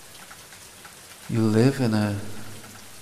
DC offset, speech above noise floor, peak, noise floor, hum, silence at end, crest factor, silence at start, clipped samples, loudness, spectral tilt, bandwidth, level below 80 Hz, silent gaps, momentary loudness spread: under 0.1%; 24 dB; -8 dBFS; -45 dBFS; none; 0 s; 18 dB; 0 s; under 0.1%; -23 LUFS; -6.5 dB/octave; 15 kHz; -60 dBFS; none; 22 LU